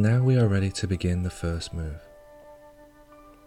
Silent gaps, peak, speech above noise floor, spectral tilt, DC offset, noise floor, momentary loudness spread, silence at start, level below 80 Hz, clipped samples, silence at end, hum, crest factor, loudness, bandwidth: none; -10 dBFS; 27 dB; -7 dB/octave; under 0.1%; -51 dBFS; 15 LU; 0 s; -42 dBFS; under 0.1%; 0.9 s; none; 16 dB; -26 LUFS; 11.5 kHz